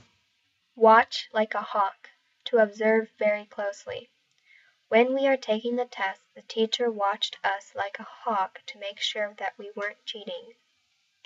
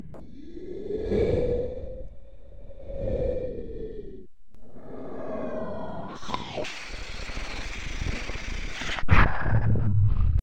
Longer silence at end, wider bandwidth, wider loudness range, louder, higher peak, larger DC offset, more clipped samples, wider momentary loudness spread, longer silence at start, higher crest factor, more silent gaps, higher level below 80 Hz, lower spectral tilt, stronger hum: first, 0.75 s vs 0 s; second, 7.8 kHz vs 9 kHz; about the same, 7 LU vs 9 LU; first, -26 LUFS vs -29 LUFS; about the same, -6 dBFS vs -4 dBFS; neither; neither; second, 15 LU vs 20 LU; first, 0.75 s vs 0 s; about the same, 20 dB vs 22 dB; neither; second, -82 dBFS vs -34 dBFS; second, -3.5 dB/octave vs -6.5 dB/octave; neither